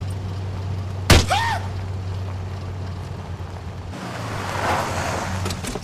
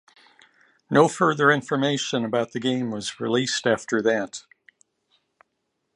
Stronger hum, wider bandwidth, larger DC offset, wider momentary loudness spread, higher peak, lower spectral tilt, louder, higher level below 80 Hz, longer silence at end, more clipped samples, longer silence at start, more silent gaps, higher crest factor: neither; first, 14.5 kHz vs 11 kHz; neither; first, 16 LU vs 8 LU; about the same, -2 dBFS vs -2 dBFS; about the same, -4.5 dB/octave vs -4.5 dB/octave; about the same, -24 LUFS vs -23 LUFS; first, -32 dBFS vs -68 dBFS; second, 0 s vs 1.55 s; neither; second, 0 s vs 0.9 s; neither; about the same, 20 dB vs 22 dB